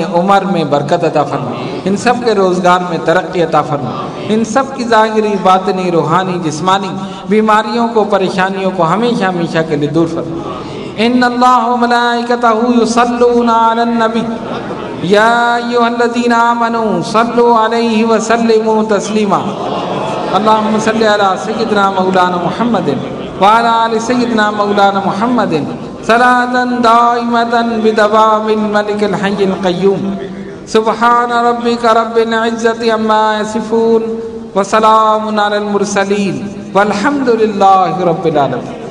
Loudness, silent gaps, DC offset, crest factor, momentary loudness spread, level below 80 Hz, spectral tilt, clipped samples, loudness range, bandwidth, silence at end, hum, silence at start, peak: -11 LUFS; none; under 0.1%; 12 dB; 8 LU; -48 dBFS; -5.5 dB/octave; 0.6%; 2 LU; 12 kHz; 0 s; none; 0 s; 0 dBFS